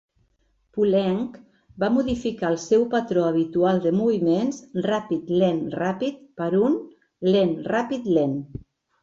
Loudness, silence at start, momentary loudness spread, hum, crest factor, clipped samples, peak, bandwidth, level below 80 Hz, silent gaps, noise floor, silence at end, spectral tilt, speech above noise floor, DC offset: -23 LUFS; 0.75 s; 8 LU; none; 16 dB; under 0.1%; -8 dBFS; 7.8 kHz; -56 dBFS; none; -67 dBFS; 0.45 s; -7 dB/octave; 45 dB; under 0.1%